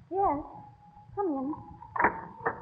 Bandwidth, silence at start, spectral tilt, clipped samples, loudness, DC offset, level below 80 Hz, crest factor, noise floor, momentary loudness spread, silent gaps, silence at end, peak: 5 kHz; 0.1 s; -10 dB/octave; under 0.1%; -32 LUFS; under 0.1%; -56 dBFS; 22 dB; -53 dBFS; 14 LU; none; 0 s; -10 dBFS